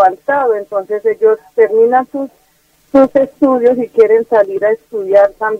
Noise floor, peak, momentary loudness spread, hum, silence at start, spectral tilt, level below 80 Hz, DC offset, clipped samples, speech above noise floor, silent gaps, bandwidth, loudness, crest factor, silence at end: -54 dBFS; 0 dBFS; 8 LU; none; 0 s; -7 dB/octave; -54 dBFS; under 0.1%; under 0.1%; 42 dB; none; 5.8 kHz; -12 LUFS; 12 dB; 0 s